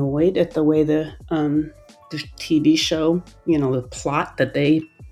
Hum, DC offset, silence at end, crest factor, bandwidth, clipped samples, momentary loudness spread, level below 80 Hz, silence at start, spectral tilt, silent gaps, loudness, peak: none; under 0.1%; 0 s; 16 dB; 13.5 kHz; under 0.1%; 10 LU; -46 dBFS; 0 s; -6 dB/octave; none; -20 LUFS; -4 dBFS